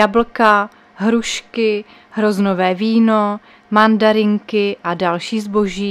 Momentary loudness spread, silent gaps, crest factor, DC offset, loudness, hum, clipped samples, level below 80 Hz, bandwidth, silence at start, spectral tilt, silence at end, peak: 8 LU; none; 16 dB; under 0.1%; -16 LUFS; none; under 0.1%; -50 dBFS; 12 kHz; 0 s; -5.5 dB/octave; 0 s; 0 dBFS